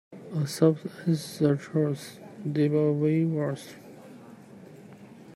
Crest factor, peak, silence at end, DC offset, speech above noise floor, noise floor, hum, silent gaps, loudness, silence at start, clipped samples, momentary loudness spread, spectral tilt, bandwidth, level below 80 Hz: 20 dB; -8 dBFS; 0.05 s; under 0.1%; 22 dB; -48 dBFS; none; none; -27 LUFS; 0.1 s; under 0.1%; 24 LU; -7.5 dB/octave; 13.5 kHz; -72 dBFS